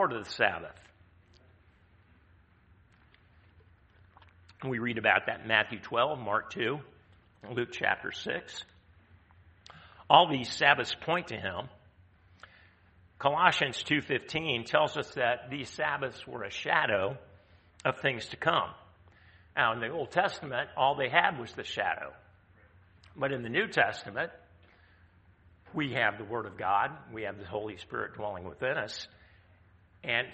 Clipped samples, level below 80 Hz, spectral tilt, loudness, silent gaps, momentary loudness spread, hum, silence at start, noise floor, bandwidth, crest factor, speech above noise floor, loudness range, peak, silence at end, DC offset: under 0.1%; -66 dBFS; -4.5 dB/octave; -30 LUFS; none; 14 LU; none; 0 s; -62 dBFS; 8.4 kHz; 28 dB; 32 dB; 6 LU; -6 dBFS; 0 s; under 0.1%